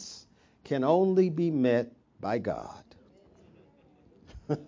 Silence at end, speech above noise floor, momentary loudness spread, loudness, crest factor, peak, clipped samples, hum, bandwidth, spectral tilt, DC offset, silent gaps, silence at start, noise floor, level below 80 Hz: 0 s; 34 dB; 21 LU; -28 LUFS; 18 dB; -12 dBFS; under 0.1%; none; 7.6 kHz; -7.5 dB/octave; under 0.1%; none; 0 s; -60 dBFS; -62 dBFS